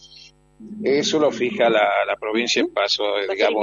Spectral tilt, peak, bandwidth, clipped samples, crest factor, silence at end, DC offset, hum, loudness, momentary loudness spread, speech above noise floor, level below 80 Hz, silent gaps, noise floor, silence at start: -3 dB/octave; -4 dBFS; 7.6 kHz; under 0.1%; 16 dB; 0 s; under 0.1%; none; -20 LUFS; 5 LU; 28 dB; -62 dBFS; none; -48 dBFS; 0.05 s